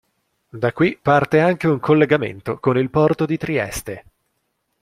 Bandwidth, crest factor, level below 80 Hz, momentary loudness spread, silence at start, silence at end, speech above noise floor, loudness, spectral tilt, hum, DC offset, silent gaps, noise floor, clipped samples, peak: 15.5 kHz; 18 dB; -50 dBFS; 11 LU; 0.55 s; 0.8 s; 53 dB; -18 LUFS; -6.5 dB/octave; none; under 0.1%; none; -71 dBFS; under 0.1%; -2 dBFS